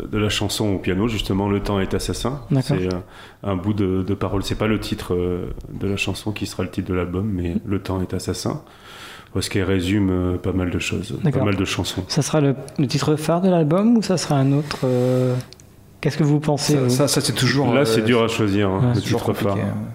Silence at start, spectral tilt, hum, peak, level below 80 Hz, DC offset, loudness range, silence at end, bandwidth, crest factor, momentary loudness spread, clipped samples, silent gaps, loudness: 0 s; -5.5 dB/octave; none; -4 dBFS; -40 dBFS; under 0.1%; 6 LU; 0 s; 16 kHz; 16 dB; 9 LU; under 0.1%; none; -21 LUFS